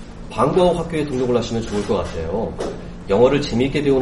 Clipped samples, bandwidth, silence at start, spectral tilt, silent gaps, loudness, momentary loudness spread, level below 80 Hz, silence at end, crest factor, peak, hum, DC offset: under 0.1%; 11.5 kHz; 0 s; -6.5 dB/octave; none; -20 LUFS; 11 LU; -36 dBFS; 0 s; 16 dB; -2 dBFS; none; under 0.1%